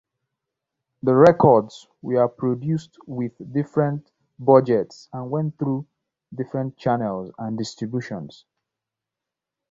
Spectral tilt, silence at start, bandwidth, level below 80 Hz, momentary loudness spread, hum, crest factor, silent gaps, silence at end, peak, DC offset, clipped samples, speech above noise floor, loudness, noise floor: -8 dB/octave; 1.05 s; 7.8 kHz; -60 dBFS; 18 LU; none; 22 dB; none; 1.45 s; -2 dBFS; under 0.1%; under 0.1%; 65 dB; -21 LUFS; -86 dBFS